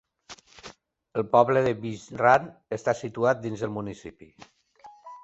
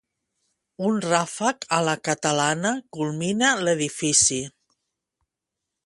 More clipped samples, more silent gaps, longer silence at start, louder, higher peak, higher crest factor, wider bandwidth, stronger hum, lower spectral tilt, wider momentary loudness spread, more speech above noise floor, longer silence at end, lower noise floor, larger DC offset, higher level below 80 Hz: neither; neither; second, 0.3 s vs 0.8 s; second, -25 LUFS vs -22 LUFS; about the same, -4 dBFS vs -4 dBFS; about the same, 22 dB vs 20 dB; second, 8.2 kHz vs 11.5 kHz; neither; first, -6 dB/octave vs -3 dB/octave; first, 25 LU vs 10 LU; second, 27 dB vs 62 dB; second, 0.05 s vs 1.35 s; second, -52 dBFS vs -85 dBFS; neither; about the same, -62 dBFS vs -62 dBFS